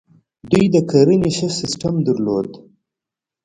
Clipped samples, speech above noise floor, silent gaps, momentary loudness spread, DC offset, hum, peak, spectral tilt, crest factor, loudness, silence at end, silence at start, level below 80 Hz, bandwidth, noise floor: under 0.1%; 70 dB; none; 8 LU; under 0.1%; none; 0 dBFS; -6 dB/octave; 18 dB; -17 LUFS; 0.85 s; 0.45 s; -48 dBFS; 11 kHz; -86 dBFS